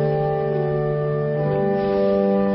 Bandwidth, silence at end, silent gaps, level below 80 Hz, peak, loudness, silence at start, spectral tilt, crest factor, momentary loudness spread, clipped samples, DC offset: 5.8 kHz; 0 s; none; -46 dBFS; -8 dBFS; -21 LUFS; 0 s; -13 dB/octave; 12 dB; 3 LU; under 0.1%; under 0.1%